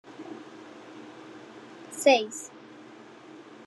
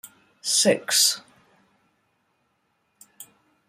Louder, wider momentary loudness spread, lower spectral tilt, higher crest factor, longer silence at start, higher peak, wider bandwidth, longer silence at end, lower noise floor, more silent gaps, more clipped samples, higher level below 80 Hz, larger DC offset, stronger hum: second, -25 LUFS vs -20 LUFS; first, 26 LU vs 14 LU; about the same, -2 dB/octave vs -1 dB/octave; about the same, 24 dB vs 24 dB; about the same, 0.05 s vs 0.05 s; second, -8 dBFS vs -4 dBFS; second, 12.5 kHz vs 16 kHz; second, 0.05 s vs 0.45 s; second, -49 dBFS vs -71 dBFS; neither; neither; second, -88 dBFS vs -76 dBFS; neither; neither